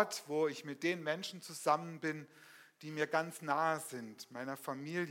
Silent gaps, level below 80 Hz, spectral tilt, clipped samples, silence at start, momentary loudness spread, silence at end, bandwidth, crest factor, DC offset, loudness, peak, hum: none; under -90 dBFS; -4 dB/octave; under 0.1%; 0 s; 13 LU; 0 s; 16.5 kHz; 22 dB; under 0.1%; -38 LUFS; -16 dBFS; none